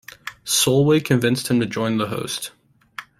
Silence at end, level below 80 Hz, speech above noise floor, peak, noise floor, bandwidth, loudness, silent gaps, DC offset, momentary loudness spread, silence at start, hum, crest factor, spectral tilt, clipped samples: 0.2 s; -58 dBFS; 21 dB; -4 dBFS; -40 dBFS; 16 kHz; -20 LUFS; none; under 0.1%; 19 LU; 0.25 s; none; 16 dB; -4.5 dB/octave; under 0.1%